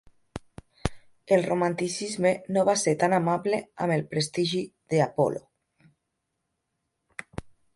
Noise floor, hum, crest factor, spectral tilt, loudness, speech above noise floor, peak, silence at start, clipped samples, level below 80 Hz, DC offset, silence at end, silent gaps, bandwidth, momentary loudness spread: -80 dBFS; none; 20 dB; -5 dB/octave; -26 LUFS; 55 dB; -8 dBFS; 0.35 s; under 0.1%; -52 dBFS; under 0.1%; 0.25 s; none; 11.5 kHz; 20 LU